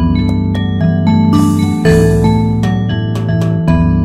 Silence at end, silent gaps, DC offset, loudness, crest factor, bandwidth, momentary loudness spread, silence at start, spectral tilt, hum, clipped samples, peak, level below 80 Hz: 0 s; none; under 0.1%; -12 LUFS; 10 dB; 13 kHz; 5 LU; 0 s; -8 dB/octave; none; under 0.1%; 0 dBFS; -24 dBFS